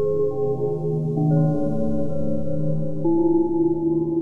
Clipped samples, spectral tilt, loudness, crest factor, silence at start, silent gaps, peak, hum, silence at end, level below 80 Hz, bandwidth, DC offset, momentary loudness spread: under 0.1%; -12 dB/octave; -22 LUFS; 10 dB; 0 s; none; -10 dBFS; none; 0 s; -48 dBFS; 1.5 kHz; under 0.1%; 6 LU